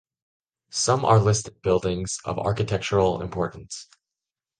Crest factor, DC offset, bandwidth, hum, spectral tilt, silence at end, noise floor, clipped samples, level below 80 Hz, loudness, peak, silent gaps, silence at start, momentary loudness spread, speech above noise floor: 20 dB; under 0.1%; 10 kHz; none; -5 dB/octave; 0.75 s; -89 dBFS; under 0.1%; -46 dBFS; -24 LUFS; -6 dBFS; none; 0.75 s; 12 LU; 66 dB